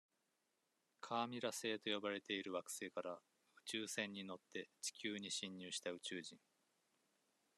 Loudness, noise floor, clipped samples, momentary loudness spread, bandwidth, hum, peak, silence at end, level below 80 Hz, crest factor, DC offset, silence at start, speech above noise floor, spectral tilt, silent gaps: -46 LUFS; -86 dBFS; under 0.1%; 9 LU; 13 kHz; none; -26 dBFS; 1.2 s; under -90 dBFS; 22 dB; under 0.1%; 1.05 s; 39 dB; -2.5 dB/octave; none